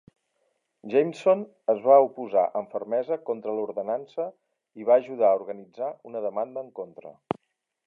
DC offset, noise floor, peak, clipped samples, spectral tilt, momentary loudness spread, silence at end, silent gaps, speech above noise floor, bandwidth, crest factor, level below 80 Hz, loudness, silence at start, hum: under 0.1%; -79 dBFS; -6 dBFS; under 0.1%; -7 dB/octave; 16 LU; 0.75 s; none; 54 dB; 7.4 kHz; 20 dB; -78 dBFS; -26 LUFS; 0.85 s; none